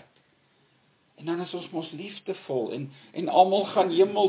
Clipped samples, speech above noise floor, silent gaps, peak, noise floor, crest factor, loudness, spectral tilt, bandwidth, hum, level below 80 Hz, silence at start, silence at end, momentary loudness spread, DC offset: under 0.1%; 40 dB; none; -6 dBFS; -65 dBFS; 20 dB; -27 LUFS; -9.5 dB/octave; 4 kHz; none; -80 dBFS; 1.2 s; 0 s; 16 LU; under 0.1%